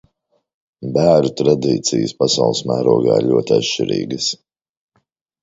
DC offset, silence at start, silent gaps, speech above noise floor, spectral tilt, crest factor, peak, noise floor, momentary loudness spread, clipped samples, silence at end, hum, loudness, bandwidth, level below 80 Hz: under 0.1%; 0.8 s; none; 50 dB; -5 dB/octave; 18 dB; 0 dBFS; -66 dBFS; 7 LU; under 0.1%; 1.05 s; none; -16 LUFS; 8 kHz; -54 dBFS